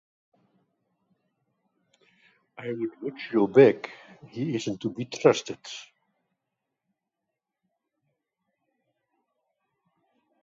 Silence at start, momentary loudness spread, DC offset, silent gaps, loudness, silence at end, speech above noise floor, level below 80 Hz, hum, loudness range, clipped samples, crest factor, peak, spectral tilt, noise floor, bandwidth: 2.6 s; 22 LU; under 0.1%; none; -25 LUFS; 4.6 s; 60 dB; -74 dBFS; none; 14 LU; under 0.1%; 26 dB; -4 dBFS; -6 dB/octave; -85 dBFS; 7.8 kHz